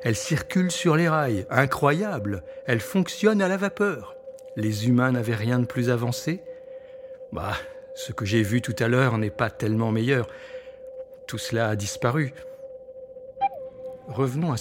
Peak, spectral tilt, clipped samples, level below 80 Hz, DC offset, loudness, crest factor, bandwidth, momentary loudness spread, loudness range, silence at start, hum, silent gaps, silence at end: -2 dBFS; -6 dB/octave; under 0.1%; -56 dBFS; under 0.1%; -25 LUFS; 24 dB; 17 kHz; 19 LU; 5 LU; 0 s; none; none; 0 s